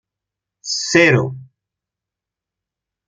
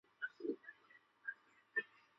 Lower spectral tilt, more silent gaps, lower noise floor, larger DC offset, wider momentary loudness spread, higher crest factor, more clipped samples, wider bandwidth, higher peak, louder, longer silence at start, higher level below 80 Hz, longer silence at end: first, -4 dB/octave vs -1.5 dB/octave; neither; first, -86 dBFS vs -70 dBFS; neither; second, 15 LU vs 18 LU; about the same, 20 dB vs 22 dB; neither; first, 9.4 kHz vs 7.4 kHz; first, -2 dBFS vs -28 dBFS; first, -15 LUFS vs -47 LUFS; first, 0.65 s vs 0.2 s; first, -60 dBFS vs under -90 dBFS; first, 1.65 s vs 0.35 s